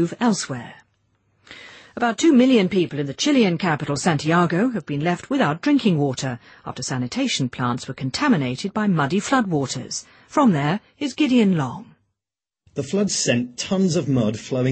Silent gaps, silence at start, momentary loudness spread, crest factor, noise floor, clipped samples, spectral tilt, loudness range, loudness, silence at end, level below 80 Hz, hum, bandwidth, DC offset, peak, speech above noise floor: none; 0 s; 12 LU; 16 dB; -89 dBFS; under 0.1%; -5 dB/octave; 4 LU; -21 LUFS; 0 s; -58 dBFS; none; 8.8 kHz; under 0.1%; -4 dBFS; 69 dB